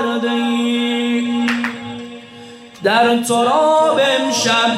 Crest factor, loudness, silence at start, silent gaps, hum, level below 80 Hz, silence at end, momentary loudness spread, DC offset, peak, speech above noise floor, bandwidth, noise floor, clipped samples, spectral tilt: 12 dB; -15 LUFS; 0 s; none; none; -66 dBFS; 0 s; 17 LU; under 0.1%; -4 dBFS; 23 dB; 15 kHz; -37 dBFS; under 0.1%; -3 dB/octave